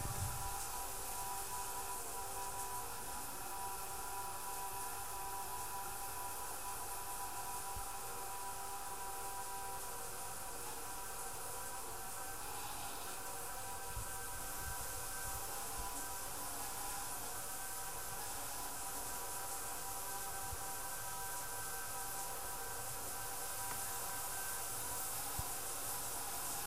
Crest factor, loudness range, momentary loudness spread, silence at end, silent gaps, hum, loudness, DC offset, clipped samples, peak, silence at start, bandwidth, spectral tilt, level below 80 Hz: 18 dB; 3 LU; 4 LU; 0 s; none; none; -43 LUFS; 0.4%; under 0.1%; -28 dBFS; 0 s; 16 kHz; -1.5 dB/octave; -58 dBFS